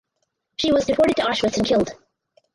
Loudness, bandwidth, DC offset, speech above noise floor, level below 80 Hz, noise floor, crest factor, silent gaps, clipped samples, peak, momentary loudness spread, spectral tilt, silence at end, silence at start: -20 LUFS; 11.5 kHz; under 0.1%; 56 dB; -50 dBFS; -75 dBFS; 14 dB; none; under 0.1%; -8 dBFS; 8 LU; -4.5 dB/octave; 0.6 s; 0.6 s